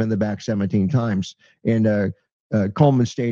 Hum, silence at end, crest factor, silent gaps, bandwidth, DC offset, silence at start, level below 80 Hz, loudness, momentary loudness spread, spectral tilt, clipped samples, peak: none; 0 s; 18 dB; 2.32-2.50 s; 7.4 kHz; under 0.1%; 0 s; -56 dBFS; -21 LUFS; 10 LU; -8 dB/octave; under 0.1%; -4 dBFS